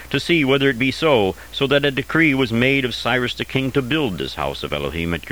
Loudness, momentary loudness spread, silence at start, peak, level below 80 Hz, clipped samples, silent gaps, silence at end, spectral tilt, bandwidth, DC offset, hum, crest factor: -19 LUFS; 8 LU; 0 s; -2 dBFS; -42 dBFS; under 0.1%; none; 0 s; -5.5 dB/octave; over 20 kHz; 0.4%; none; 18 dB